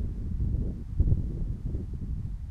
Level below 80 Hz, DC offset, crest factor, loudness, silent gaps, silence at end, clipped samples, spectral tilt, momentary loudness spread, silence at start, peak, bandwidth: -32 dBFS; under 0.1%; 18 dB; -33 LUFS; none; 0 s; under 0.1%; -11 dB/octave; 8 LU; 0 s; -12 dBFS; 2.4 kHz